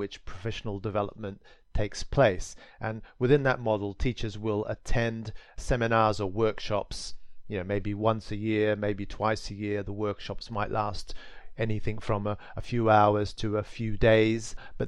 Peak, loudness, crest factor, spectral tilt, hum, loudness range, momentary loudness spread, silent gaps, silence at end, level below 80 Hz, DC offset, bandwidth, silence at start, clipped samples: -8 dBFS; -29 LUFS; 20 dB; -6 dB/octave; none; 5 LU; 14 LU; none; 0 s; -42 dBFS; under 0.1%; 11 kHz; 0 s; under 0.1%